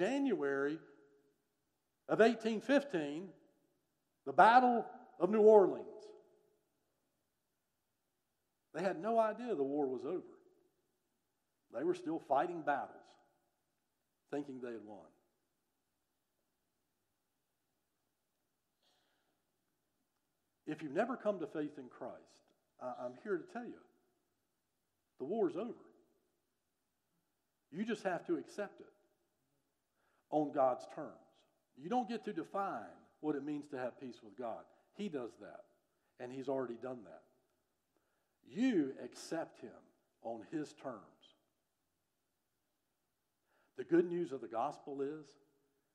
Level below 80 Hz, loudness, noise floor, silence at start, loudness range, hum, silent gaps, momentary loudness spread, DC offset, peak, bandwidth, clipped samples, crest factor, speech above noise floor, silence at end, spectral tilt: under -90 dBFS; -37 LUFS; -87 dBFS; 0 s; 17 LU; none; none; 20 LU; under 0.1%; -14 dBFS; 11 kHz; under 0.1%; 26 dB; 50 dB; 0.7 s; -6 dB/octave